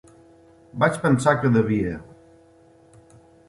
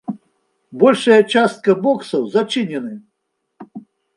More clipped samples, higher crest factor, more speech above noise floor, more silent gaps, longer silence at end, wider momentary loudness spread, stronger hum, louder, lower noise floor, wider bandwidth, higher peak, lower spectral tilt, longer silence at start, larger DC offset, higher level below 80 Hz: neither; about the same, 20 dB vs 18 dB; second, 33 dB vs 58 dB; neither; first, 1.45 s vs 0.35 s; second, 15 LU vs 25 LU; neither; second, -21 LUFS vs -16 LUFS; second, -53 dBFS vs -73 dBFS; about the same, 11.5 kHz vs 11.5 kHz; second, -4 dBFS vs 0 dBFS; first, -7 dB/octave vs -5.5 dB/octave; first, 0.75 s vs 0.1 s; neither; first, -52 dBFS vs -68 dBFS